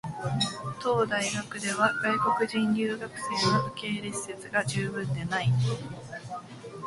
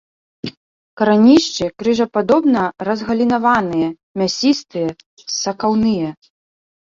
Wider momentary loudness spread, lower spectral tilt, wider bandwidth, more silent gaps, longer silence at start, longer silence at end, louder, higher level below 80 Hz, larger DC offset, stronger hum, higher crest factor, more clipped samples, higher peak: about the same, 13 LU vs 13 LU; about the same, -4.5 dB/octave vs -4.5 dB/octave; first, 11.5 kHz vs 7.6 kHz; second, none vs 0.57-0.97 s, 4.03-4.15 s, 5.06-5.17 s; second, 0.05 s vs 0.45 s; second, 0 s vs 0.8 s; second, -28 LUFS vs -16 LUFS; second, -60 dBFS vs -52 dBFS; neither; neither; about the same, 20 dB vs 16 dB; neither; second, -10 dBFS vs -2 dBFS